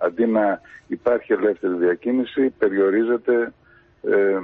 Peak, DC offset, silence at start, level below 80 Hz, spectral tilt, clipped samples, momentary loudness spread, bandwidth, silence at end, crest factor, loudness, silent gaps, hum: -6 dBFS; under 0.1%; 0 s; -62 dBFS; -9 dB/octave; under 0.1%; 7 LU; 4.1 kHz; 0 s; 14 dB; -21 LUFS; none; none